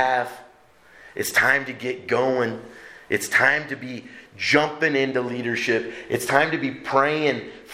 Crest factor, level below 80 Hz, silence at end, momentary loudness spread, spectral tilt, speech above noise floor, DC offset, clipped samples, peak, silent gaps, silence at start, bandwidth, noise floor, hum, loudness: 22 dB; -64 dBFS; 0 s; 14 LU; -4 dB/octave; 30 dB; under 0.1%; under 0.1%; -2 dBFS; none; 0 s; 16.5 kHz; -53 dBFS; none; -22 LUFS